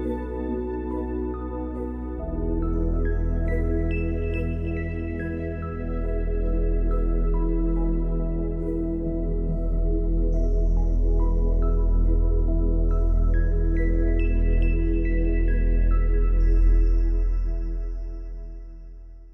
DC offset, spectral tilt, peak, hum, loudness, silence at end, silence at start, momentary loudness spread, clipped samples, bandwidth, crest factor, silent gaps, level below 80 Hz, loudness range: under 0.1%; -10.5 dB/octave; -12 dBFS; none; -26 LUFS; 0 s; 0 s; 7 LU; under 0.1%; 2.8 kHz; 10 dB; none; -22 dBFS; 4 LU